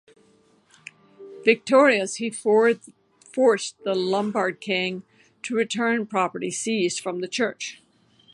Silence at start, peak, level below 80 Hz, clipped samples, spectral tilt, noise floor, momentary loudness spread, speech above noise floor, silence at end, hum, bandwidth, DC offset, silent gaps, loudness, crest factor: 1.2 s; -4 dBFS; -76 dBFS; under 0.1%; -3.5 dB/octave; -60 dBFS; 11 LU; 37 dB; 0.6 s; none; 11.5 kHz; under 0.1%; none; -23 LUFS; 22 dB